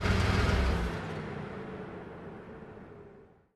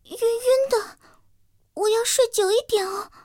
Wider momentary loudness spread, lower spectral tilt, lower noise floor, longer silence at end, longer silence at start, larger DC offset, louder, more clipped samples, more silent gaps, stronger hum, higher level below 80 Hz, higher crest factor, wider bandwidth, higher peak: first, 21 LU vs 9 LU; first, -6 dB/octave vs -0.5 dB/octave; second, -56 dBFS vs -63 dBFS; about the same, 0.3 s vs 0.2 s; about the same, 0 s vs 0.1 s; neither; second, -33 LUFS vs -22 LUFS; neither; neither; neither; first, -38 dBFS vs -62 dBFS; about the same, 18 dB vs 16 dB; second, 12.5 kHz vs 17 kHz; second, -16 dBFS vs -8 dBFS